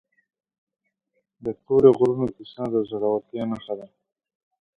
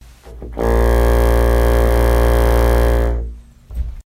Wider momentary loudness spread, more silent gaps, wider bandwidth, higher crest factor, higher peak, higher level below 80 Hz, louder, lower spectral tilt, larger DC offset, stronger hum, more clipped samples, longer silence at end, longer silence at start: about the same, 17 LU vs 16 LU; neither; second, 4.7 kHz vs 16 kHz; first, 22 dB vs 14 dB; about the same, -2 dBFS vs 0 dBFS; second, -60 dBFS vs -16 dBFS; second, -23 LUFS vs -15 LUFS; first, -9 dB/octave vs -7 dB/octave; neither; neither; neither; first, 0.9 s vs 0.05 s; first, 1.45 s vs 0.25 s